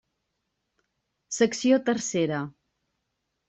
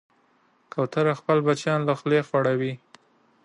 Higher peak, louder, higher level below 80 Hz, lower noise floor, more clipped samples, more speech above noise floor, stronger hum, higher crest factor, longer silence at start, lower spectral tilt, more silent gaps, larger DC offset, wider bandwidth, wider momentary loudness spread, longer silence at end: about the same, -10 dBFS vs -8 dBFS; about the same, -25 LUFS vs -24 LUFS; about the same, -70 dBFS vs -72 dBFS; first, -80 dBFS vs -64 dBFS; neither; first, 55 dB vs 41 dB; neither; about the same, 18 dB vs 18 dB; first, 1.3 s vs 0.75 s; second, -4.5 dB/octave vs -6.5 dB/octave; neither; neither; second, 8.4 kHz vs 10.5 kHz; first, 12 LU vs 9 LU; first, 1 s vs 0.7 s